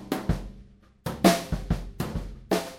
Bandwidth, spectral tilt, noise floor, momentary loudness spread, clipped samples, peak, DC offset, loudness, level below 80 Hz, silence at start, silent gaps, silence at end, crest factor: 16.5 kHz; -5.5 dB/octave; -52 dBFS; 15 LU; under 0.1%; -4 dBFS; under 0.1%; -28 LUFS; -38 dBFS; 0 s; none; 0 s; 24 dB